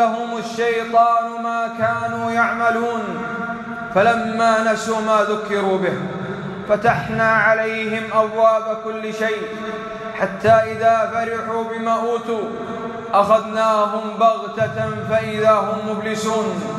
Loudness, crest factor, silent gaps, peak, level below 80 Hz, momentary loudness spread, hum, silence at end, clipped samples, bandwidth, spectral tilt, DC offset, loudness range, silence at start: -19 LUFS; 16 dB; none; -4 dBFS; -56 dBFS; 11 LU; none; 0 s; under 0.1%; 12.5 kHz; -5.5 dB/octave; under 0.1%; 1 LU; 0 s